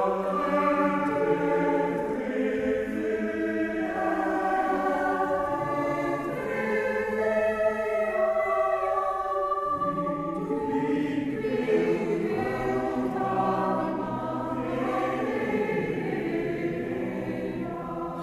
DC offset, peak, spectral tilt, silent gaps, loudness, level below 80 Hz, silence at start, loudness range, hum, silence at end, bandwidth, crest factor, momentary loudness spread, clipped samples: under 0.1%; -12 dBFS; -7 dB/octave; none; -27 LUFS; -54 dBFS; 0 s; 2 LU; none; 0 s; 14.5 kHz; 16 dB; 5 LU; under 0.1%